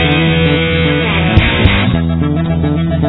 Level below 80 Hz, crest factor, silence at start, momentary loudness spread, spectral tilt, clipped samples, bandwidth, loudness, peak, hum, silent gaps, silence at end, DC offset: -22 dBFS; 12 dB; 0 s; 4 LU; -9.5 dB/octave; 0.5%; 4.1 kHz; -12 LUFS; 0 dBFS; none; none; 0 s; 0.4%